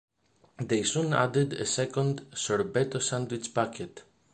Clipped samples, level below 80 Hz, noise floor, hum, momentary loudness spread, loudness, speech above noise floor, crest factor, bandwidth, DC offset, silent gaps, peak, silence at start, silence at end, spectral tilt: under 0.1%; -64 dBFS; -62 dBFS; none; 7 LU; -29 LUFS; 33 dB; 22 dB; 9.8 kHz; under 0.1%; none; -8 dBFS; 0.6 s; 0.3 s; -4.5 dB/octave